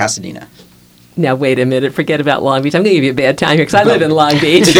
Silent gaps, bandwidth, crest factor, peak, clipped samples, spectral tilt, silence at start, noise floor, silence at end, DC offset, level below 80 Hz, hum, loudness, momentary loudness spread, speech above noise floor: none; 17.5 kHz; 12 dB; 0 dBFS; 0.2%; -4.5 dB/octave; 0 s; -44 dBFS; 0 s; under 0.1%; -48 dBFS; none; -12 LUFS; 8 LU; 33 dB